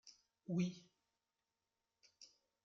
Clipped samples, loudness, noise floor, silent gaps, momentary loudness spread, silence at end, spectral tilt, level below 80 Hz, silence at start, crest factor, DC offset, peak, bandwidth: under 0.1%; -43 LUFS; under -90 dBFS; none; 22 LU; 0.4 s; -7.5 dB/octave; -88 dBFS; 0.05 s; 22 dB; under 0.1%; -28 dBFS; 7.4 kHz